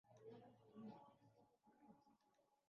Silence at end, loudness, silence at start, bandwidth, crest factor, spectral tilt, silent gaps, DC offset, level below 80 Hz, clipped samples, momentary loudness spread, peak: 0 s; -63 LUFS; 0.05 s; 6 kHz; 18 dB; -7 dB/octave; none; under 0.1%; under -90 dBFS; under 0.1%; 6 LU; -48 dBFS